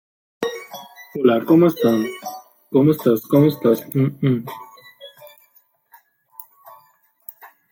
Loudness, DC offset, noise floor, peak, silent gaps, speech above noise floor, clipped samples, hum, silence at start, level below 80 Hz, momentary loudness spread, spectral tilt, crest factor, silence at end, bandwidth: -18 LUFS; under 0.1%; -58 dBFS; -2 dBFS; none; 41 dB; under 0.1%; none; 0.4 s; -64 dBFS; 25 LU; -7.5 dB/octave; 18 dB; 0.25 s; 17 kHz